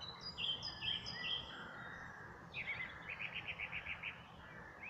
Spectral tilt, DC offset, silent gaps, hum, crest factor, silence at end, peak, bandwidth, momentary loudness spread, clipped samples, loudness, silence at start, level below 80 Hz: -3 dB/octave; under 0.1%; none; none; 16 dB; 0 s; -30 dBFS; 15 kHz; 13 LU; under 0.1%; -44 LUFS; 0 s; -66 dBFS